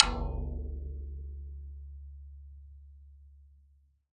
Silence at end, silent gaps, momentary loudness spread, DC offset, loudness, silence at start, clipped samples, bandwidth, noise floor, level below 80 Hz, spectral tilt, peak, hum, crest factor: 0.55 s; none; 19 LU; under 0.1%; -37 LUFS; 0 s; under 0.1%; 7 kHz; -65 dBFS; -42 dBFS; -4.5 dB/octave; 0 dBFS; none; 36 dB